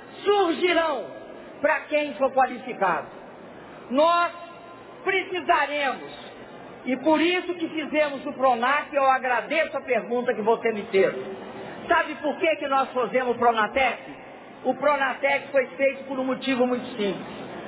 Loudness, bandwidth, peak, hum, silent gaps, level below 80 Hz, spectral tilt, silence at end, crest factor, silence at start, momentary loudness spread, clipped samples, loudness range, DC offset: -24 LUFS; 4 kHz; -8 dBFS; none; none; -62 dBFS; -8 dB/octave; 0 s; 16 dB; 0 s; 19 LU; under 0.1%; 2 LU; under 0.1%